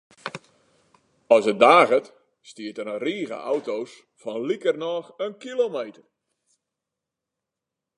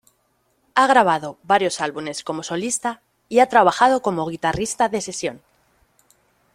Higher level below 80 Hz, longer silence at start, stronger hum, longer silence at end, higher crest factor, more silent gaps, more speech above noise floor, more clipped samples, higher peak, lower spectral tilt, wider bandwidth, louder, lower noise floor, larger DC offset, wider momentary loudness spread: second, -80 dBFS vs -56 dBFS; second, 0.25 s vs 0.75 s; neither; first, 2.05 s vs 1.15 s; about the same, 24 dB vs 20 dB; neither; first, 64 dB vs 47 dB; neither; about the same, -2 dBFS vs -2 dBFS; about the same, -4.5 dB/octave vs -3.5 dB/octave; second, 11 kHz vs 15.5 kHz; about the same, -22 LUFS vs -20 LUFS; first, -86 dBFS vs -66 dBFS; neither; first, 21 LU vs 13 LU